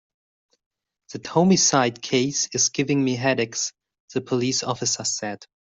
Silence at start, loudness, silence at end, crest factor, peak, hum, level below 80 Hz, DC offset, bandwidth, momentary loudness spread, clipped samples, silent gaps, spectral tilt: 1.1 s; -22 LUFS; 0.3 s; 20 dB; -4 dBFS; none; -64 dBFS; under 0.1%; 8.2 kHz; 14 LU; under 0.1%; 4.00-4.08 s; -3.5 dB/octave